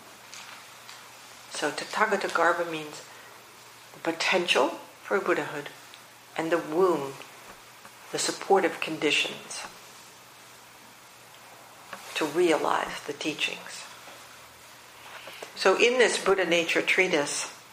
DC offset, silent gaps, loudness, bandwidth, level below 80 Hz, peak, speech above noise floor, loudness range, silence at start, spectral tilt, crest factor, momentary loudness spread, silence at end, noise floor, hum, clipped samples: under 0.1%; none; -26 LUFS; 15.5 kHz; -72 dBFS; -6 dBFS; 24 dB; 6 LU; 0 s; -2.5 dB/octave; 22 dB; 25 LU; 0 s; -51 dBFS; none; under 0.1%